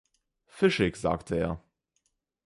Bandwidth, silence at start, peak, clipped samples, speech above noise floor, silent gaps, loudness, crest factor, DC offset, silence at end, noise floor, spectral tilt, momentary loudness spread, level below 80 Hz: 11.5 kHz; 0.55 s; -8 dBFS; under 0.1%; 50 dB; none; -28 LUFS; 22 dB; under 0.1%; 0.9 s; -77 dBFS; -6 dB/octave; 8 LU; -50 dBFS